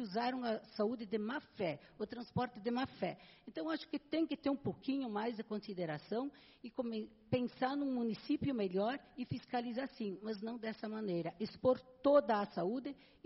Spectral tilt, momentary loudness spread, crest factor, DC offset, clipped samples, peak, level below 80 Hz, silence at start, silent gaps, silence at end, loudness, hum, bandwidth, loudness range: -5 dB/octave; 9 LU; 22 dB; under 0.1%; under 0.1%; -18 dBFS; -72 dBFS; 0 s; none; 0.3 s; -39 LUFS; none; 5.8 kHz; 4 LU